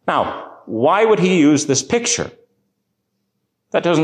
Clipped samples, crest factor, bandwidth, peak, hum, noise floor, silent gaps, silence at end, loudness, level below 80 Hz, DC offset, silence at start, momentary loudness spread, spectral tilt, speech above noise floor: under 0.1%; 14 dB; 10 kHz; -4 dBFS; none; -72 dBFS; none; 0 s; -16 LUFS; -54 dBFS; under 0.1%; 0.05 s; 13 LU; -4 dB/octave; 56 dB